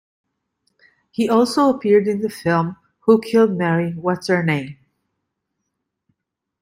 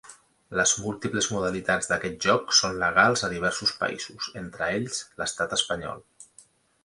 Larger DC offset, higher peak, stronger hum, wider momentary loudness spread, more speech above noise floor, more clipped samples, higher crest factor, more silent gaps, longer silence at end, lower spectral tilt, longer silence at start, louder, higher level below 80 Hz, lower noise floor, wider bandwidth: neither; about the same, -4 dBFS vs -4 dBFS; neither; second, 9 LU vs 12 LU; first, 61 dB vs 31 dB; neither; second, 16 dB vs 22 dB; neither; first, 1.9 s vs 0.6 s; first, -6.5 dB/octave vs -2 dB/octave; first, 1.2 s vs 0.05 s; first, -18 LUFS vs -25 LUFS; second, -62 dBFS vs -56 dBFS; first, -78 dBFS vs -57 dBFS; first, 16 kHz vs 11.5 kHz